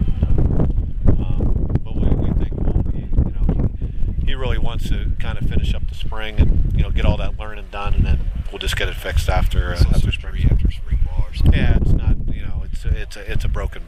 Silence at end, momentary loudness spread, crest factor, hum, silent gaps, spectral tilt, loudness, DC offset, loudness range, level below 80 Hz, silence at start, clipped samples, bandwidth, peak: 0 s; 8 LU; 14 dB; none; none; -7 dB/octave; -22 LUFS; under 0.1%; 3 LU; -18 dBFS; 0 s; under 0.1%; 13 kHz; -2 dBFS